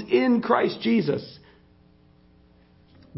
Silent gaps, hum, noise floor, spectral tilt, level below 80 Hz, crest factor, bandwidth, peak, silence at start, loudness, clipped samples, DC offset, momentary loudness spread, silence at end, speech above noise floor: none; none; -56 dBFS; -10 dB/octave; -62 dBFS; 20 dB; 5.8 kHz; -6 dBFS; 0 s; -23 LUFS; under 0.1%; under 0.1%; 10 LU; 0 s; 34 dB